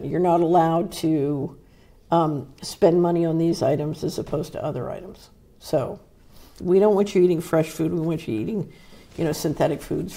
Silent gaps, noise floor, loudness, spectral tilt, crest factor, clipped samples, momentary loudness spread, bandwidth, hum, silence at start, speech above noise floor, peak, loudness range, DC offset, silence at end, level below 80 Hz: none; -52 dBFS; -22 LUFS; -7 dB/octave; 18 dB; under 0.1%; 15 LU; 16 kHz; none; 0 s; 30 dB; -4 dBFS; 4 LU; under 0.1%; 0 s; -52 dBFS